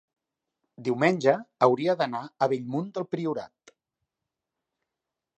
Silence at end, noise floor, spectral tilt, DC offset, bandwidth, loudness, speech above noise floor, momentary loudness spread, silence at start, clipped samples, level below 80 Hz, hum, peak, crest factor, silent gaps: 1.95 s; -87 dBFS; -6.5 dB/octave; under 0.1%; 9.2 kHz; -27 LUFS; 61 dB; 10 LU; 0.8 s; under 0.1%; -78 dBFS; none; -6 dBFS; 22 dB; none